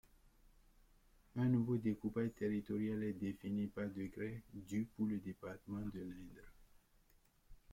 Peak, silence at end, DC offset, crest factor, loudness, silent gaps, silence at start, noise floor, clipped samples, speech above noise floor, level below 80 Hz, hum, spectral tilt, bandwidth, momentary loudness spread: -26 dBFS; 0.15 s; under 0.1%; 16 dB; -42 LUFS; none; 1.35 s; -72 dBFS; under 0.1%; 31 dB; -66 dBFS; none; -8.5 dB/octave; 16 kHz; 13 LU